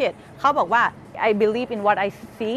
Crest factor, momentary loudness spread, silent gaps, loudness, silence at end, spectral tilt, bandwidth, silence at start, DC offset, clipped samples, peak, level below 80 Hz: 16 dB; 7 LU; none; -21 LUFS; 0 s; -5.5 dB/octave; 13.5 kHz; 0 s; under 0.1%; under 0.1%; -6 dBFS; -58 dBFS